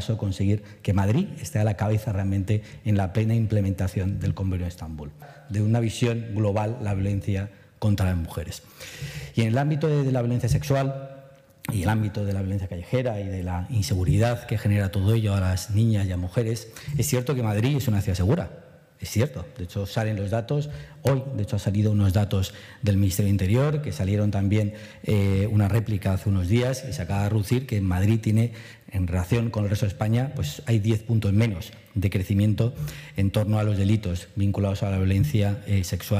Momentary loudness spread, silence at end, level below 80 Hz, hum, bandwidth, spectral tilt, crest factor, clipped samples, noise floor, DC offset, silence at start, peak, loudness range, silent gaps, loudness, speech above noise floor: 8 LU; 0 s; -46 dBFS; none; 15.5 kHz; -7 dB/octave; 16 dB; under 0.1%; -49 dBFS; under 0.1%; 0 s; -8 dBFS; 3 LU; none; -25 LUFS; 25 dB